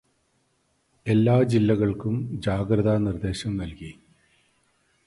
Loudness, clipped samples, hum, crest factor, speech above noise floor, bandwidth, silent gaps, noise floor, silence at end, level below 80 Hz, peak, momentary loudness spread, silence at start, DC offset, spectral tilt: -24 LUFS; under 0.1%; none; 18 dB; 46 dB; 11.5 kHz; none; -69 dBFS; 1.15 s; -46 dBFS; -8 dBFS; 16 LU; 1.05 s; under 0.1%; -8 dB/octave